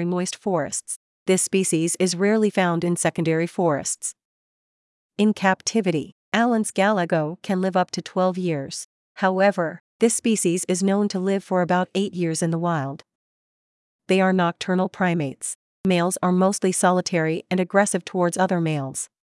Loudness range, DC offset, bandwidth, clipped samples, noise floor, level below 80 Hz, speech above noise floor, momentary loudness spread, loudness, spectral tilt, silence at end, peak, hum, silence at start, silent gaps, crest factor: 3 LU; under 0.1%; 12 kHz; under 0.1%; under -90 dBFS; -70 dBFS; over 68 dB; 9 LU; -22 LUFS; -5 dB/octave; 0.35 s; -4 dBFS; none; 0 s; 0.96-1.26 s, 4.25-5.09 s, 6.12-6.32 s, 8.84-9.15 s, 9.80-9.99 s, 13.15-13.99 s, 15.55-15.84 s; 18 dB